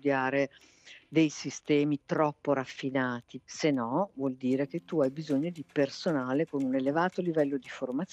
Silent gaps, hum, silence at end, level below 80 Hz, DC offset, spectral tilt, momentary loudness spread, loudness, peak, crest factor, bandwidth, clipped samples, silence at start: none; none; 0.1 s; -76 dBFS; under 0.1%; -6 dB/octave; 6 LU; -30 LUFS; -12 dBFS; 18 dB; 8.4 kHz; under 0.1%; 0.05 s